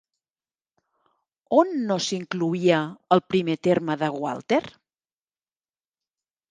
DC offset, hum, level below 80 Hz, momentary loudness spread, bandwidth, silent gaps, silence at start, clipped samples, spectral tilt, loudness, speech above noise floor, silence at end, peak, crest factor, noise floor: under 0.1%; none; -68 dBFS; 6 LU; 9.8 kHz; none; 1.5 s; under 0.1%; -5.5 dB/octave; -24 LUFS; over 67 dB; 1.8 s; -4 dBFS; 22 dB; under -90 dBFS